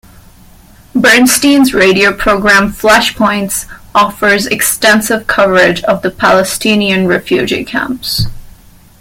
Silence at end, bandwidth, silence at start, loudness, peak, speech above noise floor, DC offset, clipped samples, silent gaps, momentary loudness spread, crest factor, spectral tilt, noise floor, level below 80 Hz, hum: 0.5 s; 17 kHz; 0.95 s; -9 LUFS; 0 dBFS; 29 dB; under 0.1%; 0.1%; none; 8 LU; 10 dB; -3.5 dB/octave; -39 dBFS; -34 dBFS; none